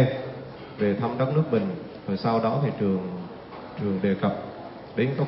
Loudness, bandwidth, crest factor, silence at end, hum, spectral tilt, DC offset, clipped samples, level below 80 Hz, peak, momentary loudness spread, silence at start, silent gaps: -27 LUFS; 5.8 kHz; 16 dB; 0 s; none; -12 dB/octave; under 0.1%; under 0.1%; -60 dBFS; -10 dBFS; 15 LU; 0 s; none